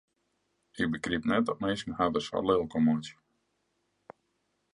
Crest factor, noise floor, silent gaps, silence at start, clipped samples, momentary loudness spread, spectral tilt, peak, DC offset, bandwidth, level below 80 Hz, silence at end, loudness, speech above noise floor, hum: 20 dB; -77 dBFS; none; 0.75 s; under 0.1%; 6 LU; -6 dB/octave; -12 dBFS; under 0.1%; 10.5 kHz; -58 dBFS; 1.65 s; -30 LUFS; 48 dB; none